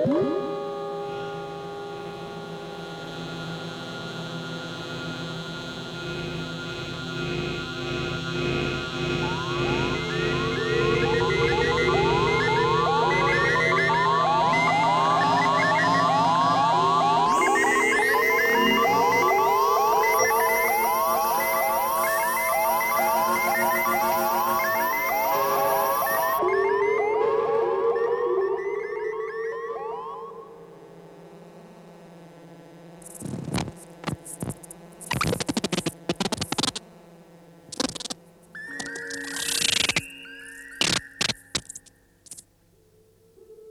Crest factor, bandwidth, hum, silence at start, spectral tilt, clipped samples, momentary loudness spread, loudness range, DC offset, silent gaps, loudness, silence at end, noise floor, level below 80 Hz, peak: 16 dB; over 20 kHz; none; 0 s; -3.5 dB/octave; under 0.1%; 15 LU; 14 LU; under 0.1%; none; -23 LUFS; 0 s; -60 dBFS; -50 dBFS; -8 dBFS